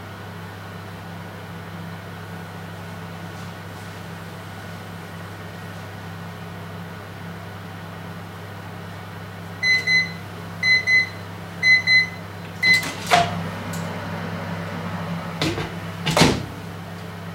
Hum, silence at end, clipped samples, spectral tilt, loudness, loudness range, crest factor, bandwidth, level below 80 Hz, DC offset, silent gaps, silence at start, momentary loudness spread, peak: none; 0 s; under 0.1%; -4 dB/octave; -20 LUFS; 17 LU; 24 dB; 16 kHz; -50 dBFS; under 0.1%; none; 0 s; 19 LU; -2 dBFS